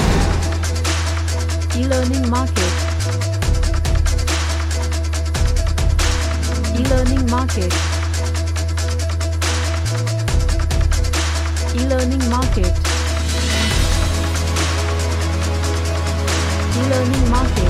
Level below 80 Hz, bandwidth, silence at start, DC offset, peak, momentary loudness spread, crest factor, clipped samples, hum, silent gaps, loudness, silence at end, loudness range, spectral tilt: -22 dBFS; 14 kHz; 0 s; 0.5%; -2 dBFS; 4 LU; 14 dB; under 0.1%; none; none; -19 LUFS; 0 s; 1 LU; -5 dB/octave